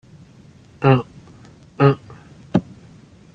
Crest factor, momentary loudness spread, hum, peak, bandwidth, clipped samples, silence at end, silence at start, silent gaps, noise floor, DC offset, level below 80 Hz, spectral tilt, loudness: 20 dB; 9 LU; none; -2 dBFS; 6.8 kHz; under 0.1%; 0.75 s; 0.8 s; none; -47 dBFS; under 0.1%; -54 dBFS; -9 dB/octave; -19 LUFS